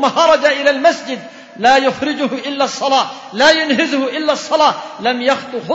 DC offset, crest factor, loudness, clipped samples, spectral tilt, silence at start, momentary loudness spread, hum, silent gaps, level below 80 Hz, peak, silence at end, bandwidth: under 0.1%; 14 dB; -14 LUFS; under 0.1%; -2.5 dB/octave; 0 s; 9 LU; none; none; -56 dBFS; 0 dBFS; 0 s; 8 kHz